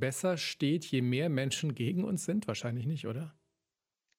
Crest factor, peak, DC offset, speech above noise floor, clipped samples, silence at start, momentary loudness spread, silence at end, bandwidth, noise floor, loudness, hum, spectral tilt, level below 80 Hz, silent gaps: 18 dB; -16 dBFS; under 0.1%; over 57 dB; under 0.1%; 0 s; 6 LU; 0.9 s; 16 kHz; under -90 dBFS; -33 LUFS; none; -5.5 dB/octave; -74 dBFS; none